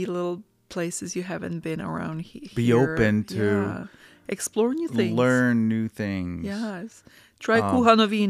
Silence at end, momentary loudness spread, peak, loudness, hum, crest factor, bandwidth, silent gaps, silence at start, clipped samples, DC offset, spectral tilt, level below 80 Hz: 0 s; 15 LU; -4 dBFS; -24 LUFS; none; 20 dB; 14.5 kHz; none; 0 s; under 0.1%; under 0.1%; -5.5 dB/octave; -54 dBFS